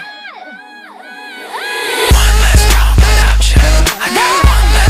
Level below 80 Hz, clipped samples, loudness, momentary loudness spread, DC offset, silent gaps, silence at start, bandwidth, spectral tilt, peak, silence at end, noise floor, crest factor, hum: -12 dBFS; 0.3%; -10 LUFS; 20 LU; under 0.1%; none; 0 s; 16 kHz; -3.5 dB/octave; 0 dBFS; 0 s; -33 dBFS; 10 dB; none